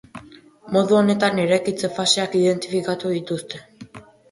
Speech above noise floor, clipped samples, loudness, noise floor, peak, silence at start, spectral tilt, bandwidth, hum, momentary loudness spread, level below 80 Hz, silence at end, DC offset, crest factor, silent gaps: 26 dB; under 0.1%; -20 LUFS; -46 dBFS; -4 dBFS; 0.15 s; -4.5 dB/octave; 11.5 kHz; none; 17 LU; -62 dBFS; 0.3 s; under 0.1%; 18 dB; none